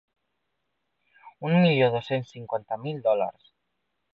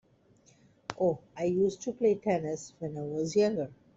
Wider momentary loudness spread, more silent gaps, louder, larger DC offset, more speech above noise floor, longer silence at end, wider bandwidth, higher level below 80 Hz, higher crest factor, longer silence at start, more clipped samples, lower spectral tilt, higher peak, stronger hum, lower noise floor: about the same, 12 LU vs 10 LU; neither; first, -26 LUFS vs -31 LUFS; neither; first, 54 dB vs 34 dB; first, 0.8 s vs 0.25 s; second, 6.6 kHz vs 8 kHz; about the same, -68 dBFS vs -68 dBFS; about the same, 18 dB vs 20 dB; first, 1.25 s vs 0.9 s; neither; first, -8.5 dB/octave vs -6 dB/octave; about the same, -10 dBFS vs -12 dBFS; neither; first, -79 dBFS vs -63 dBFS